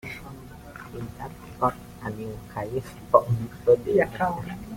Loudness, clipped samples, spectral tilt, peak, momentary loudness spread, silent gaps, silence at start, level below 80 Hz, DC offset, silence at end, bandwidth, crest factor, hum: -26 LUFS; under 0.1%; -7.5 dB/octave; -2 dBFS; 19 LU; none; 0.05 s; -50 dBFS; under 0.1%; 0 s; 16.5 kHz; 24 dB; none